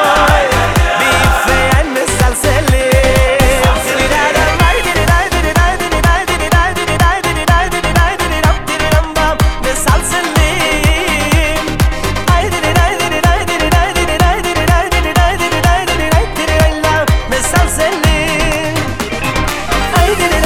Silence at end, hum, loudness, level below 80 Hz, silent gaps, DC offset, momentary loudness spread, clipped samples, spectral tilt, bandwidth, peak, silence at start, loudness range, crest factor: 0 s; none; -12 LUFS; -16 dBFS; none; 3%; 4 LU; under 0.1%; -4 dB/octave; 16 kHz; 0 dBFS; 0 s; 2 LU; 12 dB